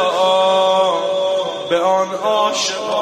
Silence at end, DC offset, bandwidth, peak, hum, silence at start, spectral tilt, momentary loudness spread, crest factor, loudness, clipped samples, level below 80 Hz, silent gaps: 0 s; under 0.1%; 13 kHz; -4 dBFS; none; 0 s; -2.5 dB/octave; 5 LU; 12 dB; -16 LUFS; under 0.1%; -66 dBFS; none